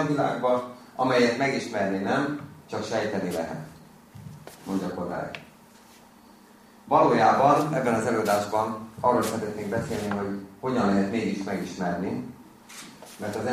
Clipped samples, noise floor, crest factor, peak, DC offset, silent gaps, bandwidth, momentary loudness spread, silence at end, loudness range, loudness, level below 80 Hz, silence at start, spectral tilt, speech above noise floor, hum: under 0.1%; -52 dBFS; 22 dB; -6 dBFS; under 0.1%; none; 15.5 kHz; 21 LU; 0 s; 9 LU; -26 LUFS; -60 dBFS; 0 s; -5.5 dB/octave; 27 dB; none